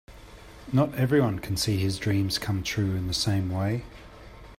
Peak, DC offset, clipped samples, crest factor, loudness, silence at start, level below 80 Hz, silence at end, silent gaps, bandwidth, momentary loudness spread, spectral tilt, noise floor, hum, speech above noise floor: -10 dBFS; under 0.1%; under 0.1%; 16 dB; -27 LUFS; 0.1 s; -48 dBFS; 0.05 s; none; 16 kHz; 22 LU; -5.5 dB/octave; -46 dBFS; none; 21 dB